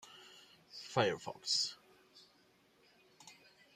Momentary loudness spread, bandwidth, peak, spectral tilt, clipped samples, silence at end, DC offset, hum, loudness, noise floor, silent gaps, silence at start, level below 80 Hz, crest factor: 24 LU; 15 kHz; -16 dBFS; -2.5 dB/octave; under 0.1%; 0.4 s; under 0.1%; none; -36 LUFS; -70 dBFS; none; 0.05 s; -82 dBFS; 26 dB